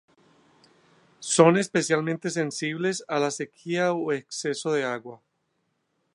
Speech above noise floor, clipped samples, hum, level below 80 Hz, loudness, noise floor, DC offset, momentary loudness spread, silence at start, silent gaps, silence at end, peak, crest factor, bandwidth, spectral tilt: 50 dB; under 0.1%; none; -76 dBFS; -25 LUFS; -74 dBFS; under 0.1%; 12 LU; 1.2 s; none; 1 s; -4 dBFS; 24 dB; 11.5 kHz; -4.5 dB/octave